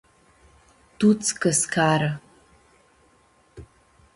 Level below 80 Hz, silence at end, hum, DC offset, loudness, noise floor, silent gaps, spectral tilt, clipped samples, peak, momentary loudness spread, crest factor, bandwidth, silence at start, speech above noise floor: -58 dBFS; 0.5 s; none; under 0.1%; -21 LUFS; -60 dBFS; none; -4 dB/octave; under 0.1%; -6 dBFS; 7 LU; 20 dB; 11.5 kHz; 1 s; 39 dB